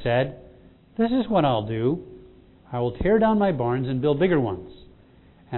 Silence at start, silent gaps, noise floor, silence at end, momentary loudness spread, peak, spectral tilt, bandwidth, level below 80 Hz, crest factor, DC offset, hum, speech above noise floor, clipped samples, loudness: 0 s; none; -53 dBFS; 0 s; 10 LU; -8 dBFS; -11.5 dB/octave; 4.2 kHz; -44 dBFS; 16 dB; under 0.1%; none; 31 dB; under 0.1%; -23 LUFS